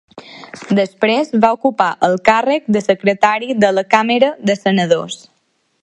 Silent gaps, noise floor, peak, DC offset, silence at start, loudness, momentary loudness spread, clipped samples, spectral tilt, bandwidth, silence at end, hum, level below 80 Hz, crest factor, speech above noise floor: none; -64 dBFS; 0 dBFS; under 0.1%; 0.15 s; -14 LUFS; 6 LU; under 0.1%; -5.5 dB/octave; 10.5 kHz; 0.65 s; none; -58 dBFS; 16 dB; 49 dB